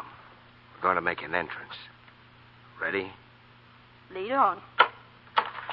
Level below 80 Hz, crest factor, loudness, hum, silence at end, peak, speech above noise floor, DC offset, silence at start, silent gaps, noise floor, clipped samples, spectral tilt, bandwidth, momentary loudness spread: -68 dBFS; 28 dB; -28 LUFS; none; 0 s; -4 dBFS; 26 dB; under 0.1%; 0 s; none; -55 dBFS; under 0.1%; -7.5 dB/octave; 5.6 kHz; 18 LU